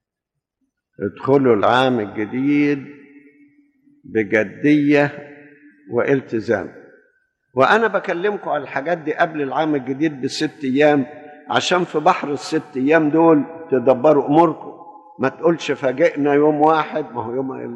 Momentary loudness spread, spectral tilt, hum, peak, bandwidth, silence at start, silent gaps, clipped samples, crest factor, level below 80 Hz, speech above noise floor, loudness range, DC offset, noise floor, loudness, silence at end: 11 LU; -6 dB/octave; none; -2 dBFS; 9.8 kHz; 1 s; none; under 0.1%; 16 dB; -66 dBFS; 64 dB; 4 LU; under 0.1%; -81 dBFS; -18 LUFS; 0 s